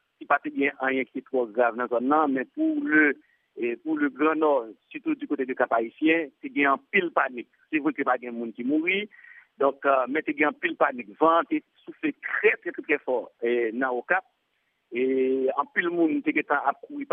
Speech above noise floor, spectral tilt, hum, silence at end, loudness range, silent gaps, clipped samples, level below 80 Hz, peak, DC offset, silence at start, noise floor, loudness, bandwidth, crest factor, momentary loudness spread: 48 dB; -8.5 dB/octave; none; 0.1 s; 2 LU; none; under 0.1%; -88 dBFS; -6 dBFS; under 0.1%; 0.2 s; -74 dBFS; -25 LUFS; 3.7 kHz; 20 dB; 9 LU